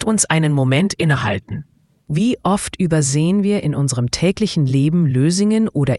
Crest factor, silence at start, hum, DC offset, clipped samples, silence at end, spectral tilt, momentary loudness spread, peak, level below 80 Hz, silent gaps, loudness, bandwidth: 16 dB; 0 s; none; under 0.1%; under 0.1%; 0 s; -5.5 dB/octave; 4 LU; 0 dBFS; -44 dBFS; none; -17 LUFS; 12 kHz